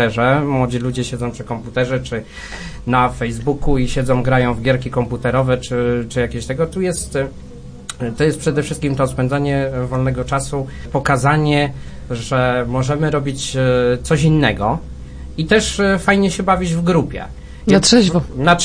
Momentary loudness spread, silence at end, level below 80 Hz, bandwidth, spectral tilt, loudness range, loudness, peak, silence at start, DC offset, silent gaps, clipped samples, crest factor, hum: 12 LU; 0 s; -32 dBFS; 10.5 kHz; -5.5 dB/octave; 4 LU; -17 LUFS; 0 dBFS; 0 s; under 0.1%; none; under 0.1%; 16 dB; none